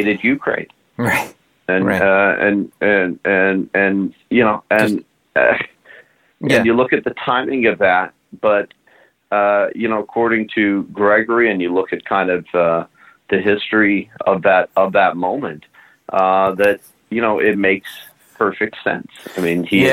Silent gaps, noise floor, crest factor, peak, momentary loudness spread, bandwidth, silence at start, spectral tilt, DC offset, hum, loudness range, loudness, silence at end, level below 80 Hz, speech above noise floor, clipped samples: none; -53 dBFS; 16 dB; -2 dBFS; 10 LU; 16.5 kHz; 0 s; -6 dB/octave; under 0.1%; none; 2 LU; -16 LUFS; 0 s; -56 dBFS; 37 dB; under 0.1%